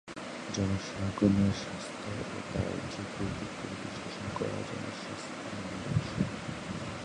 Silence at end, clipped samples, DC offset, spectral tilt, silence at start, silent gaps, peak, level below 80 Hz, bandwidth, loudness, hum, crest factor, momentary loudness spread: 0 s; under 0.1%; under 0.1%; -5.5 dB/octave; 0.05 s; none; -12 dBFS; -52 dBFS; 11 kHz; -35 LUFS; none; 22 dB; 10 LU